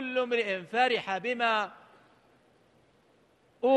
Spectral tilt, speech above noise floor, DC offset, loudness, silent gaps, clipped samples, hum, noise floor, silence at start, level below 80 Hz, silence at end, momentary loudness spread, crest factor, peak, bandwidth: -4 dB/octave; 36 dB; under 0.1%; -29 LUFS; none; under 0.1%; none; -65 dBFS; 0 s; -82 dBFS; 0 s; 5 LU; 18 dB; -12 dBFS; 9.4 kHz